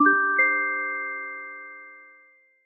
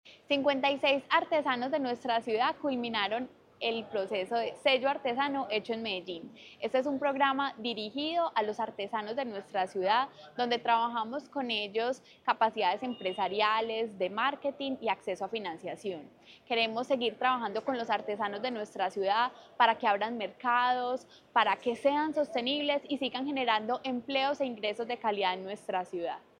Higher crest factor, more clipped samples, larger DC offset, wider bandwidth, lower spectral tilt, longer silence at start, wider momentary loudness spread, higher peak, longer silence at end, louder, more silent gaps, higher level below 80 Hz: about the same, 18 dB vs 22 dB; neither; neither; second, 2.9 kHz vs 11 kHz; about the same, -3.5 dB/octave vs -4.5 dB/octave; about the same, 0 s vs 0.05 s; first, 22 LU vs 8 LU; about the same, -8 dBFS vs -10 dBFS; first, 0.6 s vs 0.2 s; first, -23 LUFS vs -31 LUFS; neither; second, under -90 dBFS vs -78 dBFS